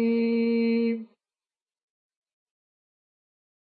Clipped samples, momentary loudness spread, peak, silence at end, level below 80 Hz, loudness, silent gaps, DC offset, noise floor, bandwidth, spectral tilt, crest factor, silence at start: under 0.1%; 6 LU; -16 dBFS; 2.7 s; under -90 dBFS; -25 LUFS; none; under 0.1%; under -90 dBFS; 4.7 kHz; -10 dB/octave; 14 dB; 0 s